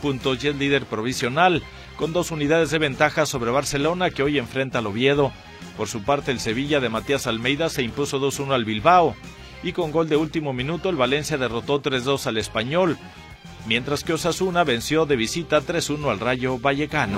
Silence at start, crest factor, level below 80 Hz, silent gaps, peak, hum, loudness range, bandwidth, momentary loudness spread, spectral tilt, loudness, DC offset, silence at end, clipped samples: 0 s; 20 dB; -46 dBFS; none; -2 dBFS; none; 2 LU; 16 kHz; 7 LU; -4.5 dB/octave; -22 LUFS; under 0.1%; 0 s; under 0.1%